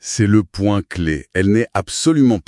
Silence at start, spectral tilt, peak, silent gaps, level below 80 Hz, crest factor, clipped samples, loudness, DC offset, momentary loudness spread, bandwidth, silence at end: 0.05 s; -5.5 dB/octave; -2 dBFS; none; -42 dBFS; 14 dB; under 0.1%; -17 LUFS; under 0.1%; 7 LU; 12 kHz; 0.05 s